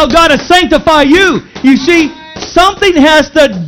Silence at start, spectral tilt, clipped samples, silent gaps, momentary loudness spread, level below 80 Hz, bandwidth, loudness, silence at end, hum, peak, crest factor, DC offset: 0 s; -4 dB/octave; 4%; none; 6 LU; -30 dBFS; 18.5 kHz; -7 LUFS; 0 s; none; 0 dBFS; 8 dB; under 0.1%